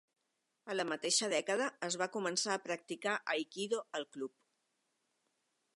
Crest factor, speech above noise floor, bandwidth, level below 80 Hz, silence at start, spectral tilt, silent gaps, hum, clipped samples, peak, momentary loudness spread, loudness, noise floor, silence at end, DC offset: 20 dB; 47 dB; 11.5 kHz; under -90 dBFS; 0.65 s; -2 dB/octave; none; none; under 0.1%; -18 dBFS; 11 LU; -37 LUFS; -84 dBFS; 1.45 s; under 0.1%